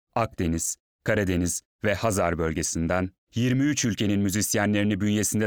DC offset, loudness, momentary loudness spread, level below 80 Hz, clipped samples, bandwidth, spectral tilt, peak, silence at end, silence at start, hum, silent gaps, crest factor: 0.1%; -25 LUFS; 5 LU; -46 dBFS; under 0.1%; over 20 kHz; -4.5 dB/octave; -10 dBFS; 0 s; 0.15 s; none; 0.80-0.99 s, 1.65-1.79 s, 3.18-3.27 s; 16 dB